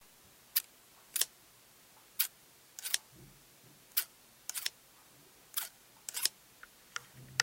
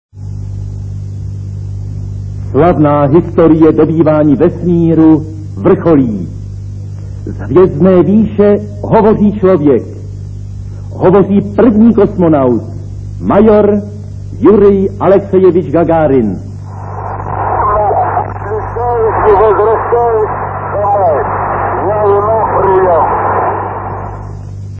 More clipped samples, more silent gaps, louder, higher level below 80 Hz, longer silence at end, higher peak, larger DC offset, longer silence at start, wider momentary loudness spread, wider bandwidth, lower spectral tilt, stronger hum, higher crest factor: second, under 0.1% vs 0.8%; neither; second, -37 LUFS vs -9 LUFS; second, -78 dBFS vs -30 dBFS; about the same, 0 s vs 0 s; second, -8 dBFS vs 0 dBFS; second, under 0.1% vs 0.4%; first, 0.55 s vs 0.15 s; first, 24 LU vs 17 LU; first, 17 kHz vs 8 kHz; second, 1.5 dB/octave vs -10.5 dB/octave; second, none vs 50 Hz at -35 dBFS; first, 34 dB vs 10 dB